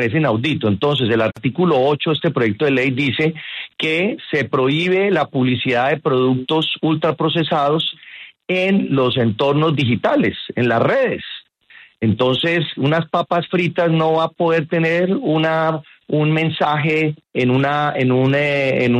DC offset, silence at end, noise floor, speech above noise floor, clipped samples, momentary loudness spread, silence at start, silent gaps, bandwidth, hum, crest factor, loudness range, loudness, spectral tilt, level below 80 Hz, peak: under 0.1%; 0 s; -47 dBFS; 30 dB; under 0.1%; 5 LU; 0 s; none; 9.2 kHz; none; 14 dB; 1 LU; -17 LUFS; -7.5 dB/octave; -56 dBFS; -4 dBFS